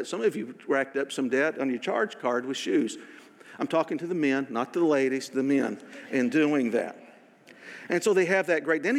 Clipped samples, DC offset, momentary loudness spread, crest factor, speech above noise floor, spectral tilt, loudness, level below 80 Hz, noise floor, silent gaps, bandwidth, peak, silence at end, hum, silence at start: under 0.1%; under 0.1%; 9 LU; 16 dB; 27 dB; -5 dB/octave; -27 LUFS; -90 dBFS; -53 dBFS; none; 14.5 kHz; -10 dBFS; 0 s; none; 0 s